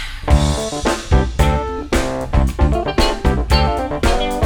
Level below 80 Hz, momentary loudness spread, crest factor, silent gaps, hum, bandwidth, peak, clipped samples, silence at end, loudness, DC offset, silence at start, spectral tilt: -20 dBFS; 4 LU; 14 dB; none; none; 17.5 kHz; -2 dBFS; under 0.1%; 0 s; -18 LUFS; under 0.1%; 0 s; -5.5 dB/octave